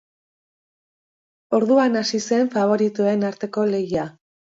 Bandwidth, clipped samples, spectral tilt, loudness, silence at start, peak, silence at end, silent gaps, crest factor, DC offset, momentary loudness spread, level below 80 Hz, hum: 7.8 kHz; under 0.1%; -5.5 dB/octave; -20 LUFS; 1.5 s; -6 dBFS; 0.5 s; none; 16 dB; under 0.1%; 8 LU; -64 dBFS; none